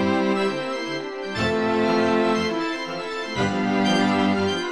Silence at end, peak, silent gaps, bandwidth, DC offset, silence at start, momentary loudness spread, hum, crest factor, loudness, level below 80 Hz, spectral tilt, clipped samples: 0 s; -8 dBFS; none; 11 kHz; 0.3%; 0 s; 9 LU; none; 14 dB; -23 LUFS; -56 dBFS; -5.5 dB/octave; under 0.1%